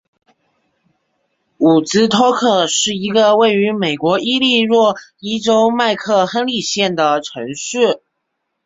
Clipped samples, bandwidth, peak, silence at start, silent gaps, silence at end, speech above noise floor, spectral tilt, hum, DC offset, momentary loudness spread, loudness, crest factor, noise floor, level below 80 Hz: under 0.1%; 8 kHz; -2 dBFS; 1.6 s; none; 0.7 s; 59 dB; -3.5 dB/octave; none; under 0.1%; 8 LU; -14 LUFS; 14 dB; -73 dBFS; -58 dBFS